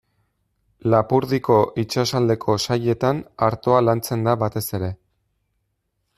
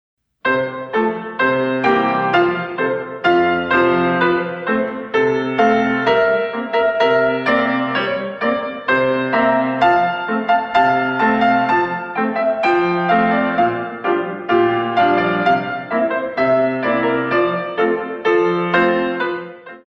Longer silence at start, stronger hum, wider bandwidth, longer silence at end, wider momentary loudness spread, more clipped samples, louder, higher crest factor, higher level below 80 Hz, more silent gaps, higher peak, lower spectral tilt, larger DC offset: first, 0.85 s vs 0.45 s; neither; first, 14.5 kHz vs 6.6 kHz; first, 1.25 s vs 0.1 s; about the same, 8 LU vs 6 LU; neither; second, -21 LUFS vs -17 LUFS; about the same, 18 dB vs 16 dB; about the same, -54 dBFS vs -54 dBFS; neither; about the same, -2 dBFS vs -2 dBFS; about the same, -6 dB/octave vs -7 dB/octave; neither